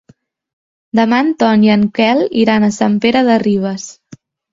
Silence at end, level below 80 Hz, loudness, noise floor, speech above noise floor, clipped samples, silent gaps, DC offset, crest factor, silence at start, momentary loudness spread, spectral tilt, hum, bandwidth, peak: 0.35 s; -52 dBFS; -13 LUFS; -41 dBFS; 29 dB; under 0.1%; none; under 0.1%; 14 dB; 0.95 s; 7 LU; -5.5 dB/octave; none; 7.6 kHz; 0 dBFS